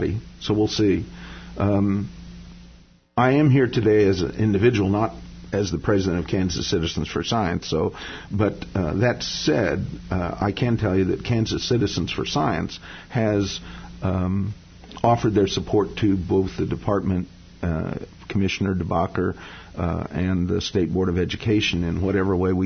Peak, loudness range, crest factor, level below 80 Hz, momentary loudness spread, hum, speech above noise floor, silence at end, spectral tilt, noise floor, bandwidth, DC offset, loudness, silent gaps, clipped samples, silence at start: -4 dBFS; 4 LU; 18 dB; -42 dBFS; 11 LU; none; 28 dB; 0 s; -6.5 dB/octave; -50 dBFS; 6.6 kHz; under 0.1%; -23 LUFS; none; under 0.1%; 0 s